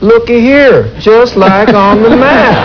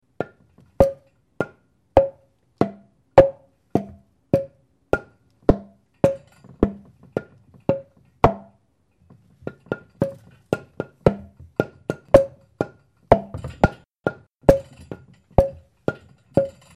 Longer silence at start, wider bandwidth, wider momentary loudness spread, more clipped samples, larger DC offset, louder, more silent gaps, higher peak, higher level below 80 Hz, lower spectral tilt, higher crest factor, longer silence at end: second, 0 s vs 0.2 s; second, 5.4 kHz vs 13 kHz; second, 2 LU vs 19 LU; first, 8% vs under 0.1%; neither; first, -5 LUFS vs -23 LUFS; second, none vs 13.85-13.89 s; about the same, 0 dBFS vs 0 dBFS; first, -30 dBFS vs -38 dBFS; about the same, -7 dB/octave vs -8 dB/octave; second, 4 dB vs 24 dB; second, 0 s vs 0.25 s